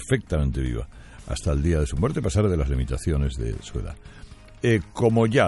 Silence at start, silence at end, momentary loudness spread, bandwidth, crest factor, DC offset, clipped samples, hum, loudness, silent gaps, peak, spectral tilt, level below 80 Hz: 0 s; 0 s; 12 LU; 11.5 kHz; 18 dB; under 0.1%; under 0.1%; none; -25 LUFS; none; -6 dBFS; -6.5 dB/octave; -32 dBFS